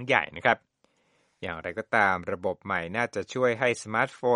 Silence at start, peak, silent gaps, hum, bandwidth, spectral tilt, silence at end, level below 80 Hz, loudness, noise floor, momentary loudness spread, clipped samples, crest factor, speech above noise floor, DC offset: 0 s; -4 dBFS; none; none; 11 kHz; -4.5 dB/octave; 0 s; -64 dBFS; -27 LUFS; -69 dBFS; 11 LU; under 0.1%; 22 dB; 42 dB; under 0.1%